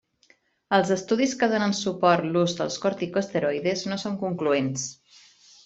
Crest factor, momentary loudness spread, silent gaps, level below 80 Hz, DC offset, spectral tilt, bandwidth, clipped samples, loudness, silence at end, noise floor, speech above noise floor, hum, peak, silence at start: 20 dB; 7 LU; none; -66 dBFS; under 0.1%; -4.5 dB/octave; 8.2 kHz; under 0.1%; -25 LUFS; 0.75 s; -63 dBFS; 38 dB; none; -6 dBFS; 0.7 s